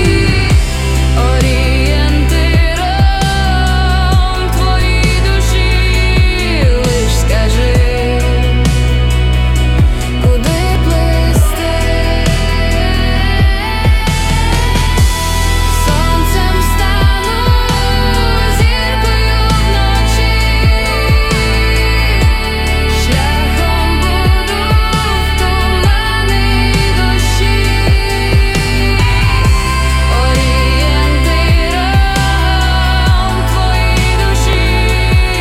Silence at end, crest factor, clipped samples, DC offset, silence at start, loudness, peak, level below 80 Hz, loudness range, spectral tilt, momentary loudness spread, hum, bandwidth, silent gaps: 0 s; 10 dB; under 0.1%; under 0.1%; 0 s; -12 LUFS; 0 dBFS; -12 dBFS; 1 LU; -5 dB/octave; 2 LU; none; 15.5 kHz; none